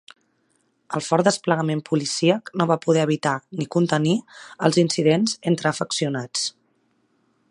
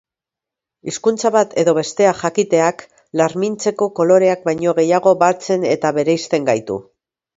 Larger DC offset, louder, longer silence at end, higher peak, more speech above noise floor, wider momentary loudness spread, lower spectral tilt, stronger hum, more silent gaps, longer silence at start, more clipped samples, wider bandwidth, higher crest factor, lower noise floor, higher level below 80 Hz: neither; second, -22 LUFS vs -16 LUFS; first, 1 s vs 0.55 s; about the same, -2 dBFS vs 0 dBFS; second, 46 dB vs 71 dB; about the same, 7 LU vs 7 LU; about the same, -5 dB/octave vs -5 dB/octave; neither; neither; about the same, 0.9 s vs 0.85 s; neither; first, 11 kHz vs 8 kHz; first, 22 dB vs 16 dB; second, -67 dBFS vs -86 dBFS; second, -68 dBFS vs -60 dBFS